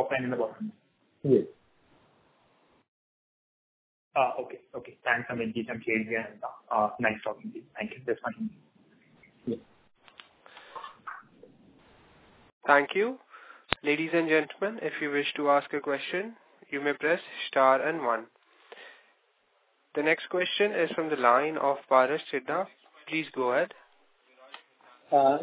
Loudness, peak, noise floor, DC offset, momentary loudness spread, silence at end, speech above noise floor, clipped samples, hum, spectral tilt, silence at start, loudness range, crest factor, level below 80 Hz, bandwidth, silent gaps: -28 LUFS; -2 dBFS; -70 dBFS; under 0.1%; 19 LU; 0 s; 42 dB; under 0.1%; none; -2.5 dB/octave; 0 s; 12 LU; 30 dB; -70 dBFS; 4 kHz; 2.88-4.11 s, 12.52-12.61 s